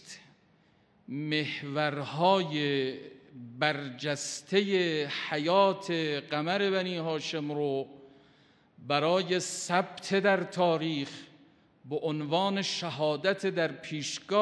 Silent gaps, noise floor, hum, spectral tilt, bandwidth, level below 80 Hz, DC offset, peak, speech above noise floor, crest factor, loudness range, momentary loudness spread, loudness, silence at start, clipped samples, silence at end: none; -65 dBFS; none; -4.5 dB/octave; 11 kHz; -82 dBFS; under 0.1%; -10 dBFS; 35 dB; 20 dB; 3 LU; 11 LU; -30 LUFS; 0.05 s; under 0.1%; 0 s